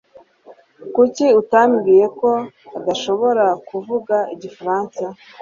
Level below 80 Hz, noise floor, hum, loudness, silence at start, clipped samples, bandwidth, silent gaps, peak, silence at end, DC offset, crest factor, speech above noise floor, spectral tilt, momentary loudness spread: -64 dBFS; -47 dBFS; none; -17 LUFS; 0.5 s; under 0.1%; 7.4 kHz; none; -2 dBFS; 0.25 s; under 0.1%; 16 dB; 30 dB; -5 dB/octave; 14 LU